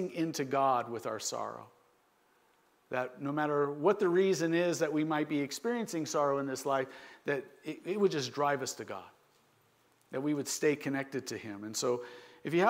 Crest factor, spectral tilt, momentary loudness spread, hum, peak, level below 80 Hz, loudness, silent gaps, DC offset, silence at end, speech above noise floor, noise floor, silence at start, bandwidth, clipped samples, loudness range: 20 dB; -4.5 dB/octave; 13 LU; none; -14 dBFS; -84 dBFS; -33 LUFS; none; under 0.1%; 0 s; 37 dB; -70 dBFS; 0 s; 16 kHz; under 0.1%; 5 LU